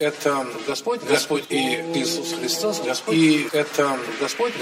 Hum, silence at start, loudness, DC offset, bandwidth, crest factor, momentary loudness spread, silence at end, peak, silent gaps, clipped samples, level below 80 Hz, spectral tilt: none; 0 s; -22 LUFS; under 0.1%; 16 kHz; 18 dB; 7 LU; 0 s; -6 dBFS; none; under 0.1%; -70 dBFS; -3.5 dB/octave